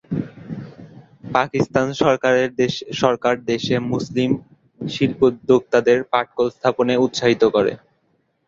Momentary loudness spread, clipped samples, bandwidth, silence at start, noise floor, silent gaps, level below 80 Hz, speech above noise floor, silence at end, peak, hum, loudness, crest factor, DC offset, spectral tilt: 12 LU; under 0.1%; 7.6 kHz; 0.1 s; -66 dBFS; none; -54 dBFS; 47 dB; 0.7 s; 0 dBFS; none; -19 LUFS; 18 dB; under 0.1%; -5.5 dB/octave